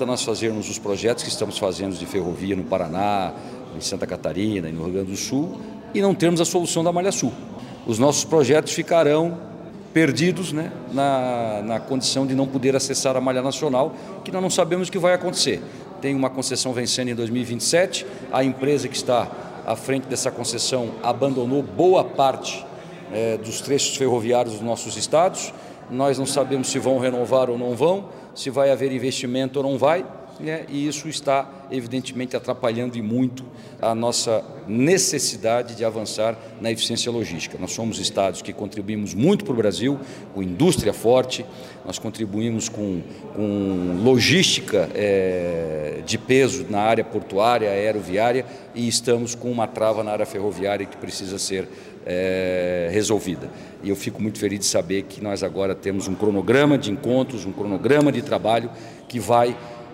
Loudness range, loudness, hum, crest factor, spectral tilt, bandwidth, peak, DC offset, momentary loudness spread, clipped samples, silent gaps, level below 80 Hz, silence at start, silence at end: 4 LU; -22 LUFS; none; 18 dB; -4.5 dB/octave; 16 kHz; -4 dBFS; under 0.1%; 11 LU; under 0.1%; none; -58 dBFS; 0 s; 0 s